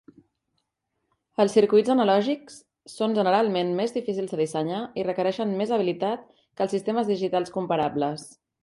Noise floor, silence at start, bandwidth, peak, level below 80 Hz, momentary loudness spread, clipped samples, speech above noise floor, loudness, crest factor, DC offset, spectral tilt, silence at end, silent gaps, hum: -79 dBFS; 1.4 s; 11.5 kHz; -8 dBFS; -70 dBFS; 9 LU; under 0.1%; 55 dB; -25 LUFS; 18 dB; under 0.1%; -6 dB/octave; 0.3 s; none; none